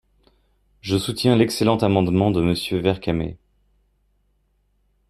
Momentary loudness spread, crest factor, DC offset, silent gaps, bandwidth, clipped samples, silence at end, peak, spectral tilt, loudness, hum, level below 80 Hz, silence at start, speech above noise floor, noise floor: 8 LU; 20 dB; under 0.1%; none; 14 kHz; under 0.1%; 1.75 s; -4 dBFS; -6 dB/octave; -20 LUFS; none; -48 dBFS; 0.85 s; 46 dB; -66 dBFS